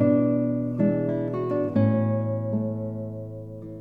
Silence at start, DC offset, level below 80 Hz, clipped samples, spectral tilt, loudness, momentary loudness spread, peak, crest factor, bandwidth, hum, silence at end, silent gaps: 0 s; 0.2%; -58 dBFS; under 0.1%; -12 dB/octave; -25 LUFS; 14 LU; -8 dBFS; 16 dB; 4.7 kHz; none; 0 s; none